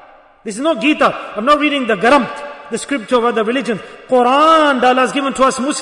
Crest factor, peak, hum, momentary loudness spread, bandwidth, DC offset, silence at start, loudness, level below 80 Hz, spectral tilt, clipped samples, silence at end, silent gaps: 14 dB; -2 dBFS; none; 14 LU; 11 kHz; under 0.1%; 0.45 s; -14 LUFS; -52 dBFS; -3.5 dB/octave; under 0.1%; 0 s; none